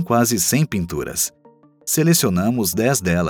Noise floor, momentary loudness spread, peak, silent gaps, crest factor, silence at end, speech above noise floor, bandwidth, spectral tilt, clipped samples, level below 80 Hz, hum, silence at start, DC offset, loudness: -46 dBFS; 8 LU; -2 dBFS; none; 16 dB; 0 s; 28 dB; over 20 kHz; -4.5 dB/octave; under 0.1%; -46 dBFS; none; 0 s; under 0.1%; -18 LUFS